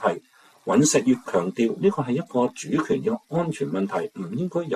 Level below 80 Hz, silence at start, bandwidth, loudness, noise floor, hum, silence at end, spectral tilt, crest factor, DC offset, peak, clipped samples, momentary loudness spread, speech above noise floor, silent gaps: -64 dBFS; 0 s; 14 kHz; -24 LUFS; -47 dBFS; none; 0 s; -5.5 dB/octave; 16 dB; under 0.1%; -8 dBFS; under 0.1%; 10 LU; 24 dB; none